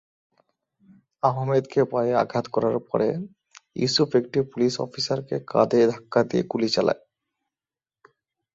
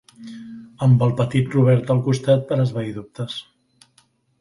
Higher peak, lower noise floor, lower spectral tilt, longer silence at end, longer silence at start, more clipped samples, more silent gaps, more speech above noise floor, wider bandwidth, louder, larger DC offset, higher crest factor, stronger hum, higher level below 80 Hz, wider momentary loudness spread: about the same, -4 dBFS vs -4 dBFS; first, under -90 dBFS vs -61 dBFS; second, -5.5 dB/octave vs -8 dB/octave; first, 1.6 s vs 1 s; first, 1.25 s vs 0.2 s; neither; neither; first, over 67 dB vs 42 dB; second, 8 kHz vs 11 kHz; second, -24 LUFS vs -20 LUFS; neither; first, 22 dB vs 16 dB; neither; second, -64 dBFS vs -54 dBFS; second, 7 LU vs 21 LU